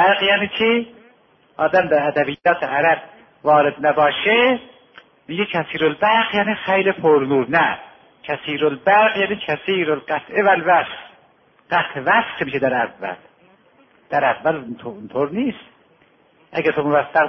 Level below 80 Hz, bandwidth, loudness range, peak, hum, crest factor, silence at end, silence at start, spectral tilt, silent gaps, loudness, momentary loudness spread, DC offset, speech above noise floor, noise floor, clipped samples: -60 dBFS; 6 kHz; 5 LU; -2 dBFS; none; 16 dB; 0 s; 0 s; -7 dB/octave; none; -18 LUFS; 13 LU; under 0.1%; 37 dB; -55 dBFS; under 0.1%